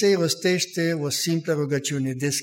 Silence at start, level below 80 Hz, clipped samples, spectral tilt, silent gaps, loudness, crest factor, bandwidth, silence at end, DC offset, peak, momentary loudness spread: 0 s; -68 dBFS; under 0.1%; -4 dB/octave; none; -23 LUFS; 14 dB; 16.5 kHz; 0 s; under 0.1%; -10 dBFS; 4 LU